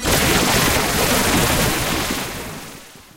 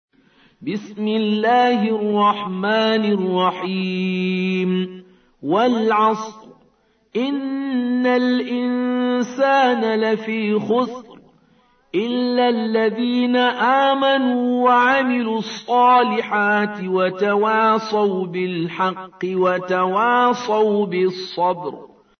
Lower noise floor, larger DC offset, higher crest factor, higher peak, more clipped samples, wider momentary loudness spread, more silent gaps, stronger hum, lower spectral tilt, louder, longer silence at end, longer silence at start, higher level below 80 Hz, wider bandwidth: second, -39 dBFS vs -60 dBFS; neither; about the same, 16 dB vs 14 dB; about the same, -4 dBFS vs -6 dBFS; neither; first, 15 LU vs 8 LU; neither; neither; second, -3 dB/octave vs -6 dB/octave; about the same, -17 LUFS vs -19 LUFS; second, 0.15 s vs 0.35 s; second, 0 s vs 0.6 s; first, -32 dBFS vs -68 dBFS; first, 16 kHz vs 6.6 kHz